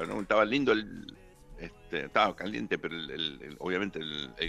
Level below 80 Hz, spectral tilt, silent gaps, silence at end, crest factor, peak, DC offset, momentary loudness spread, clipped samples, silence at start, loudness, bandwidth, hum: -56 dBFS; -5 dB/octave; none; 0 s; 22 dB; -10 dBFS; under 0.1%; 20 LU; under 0.1%; 0 s; -31 LUFS; 13 kHz; none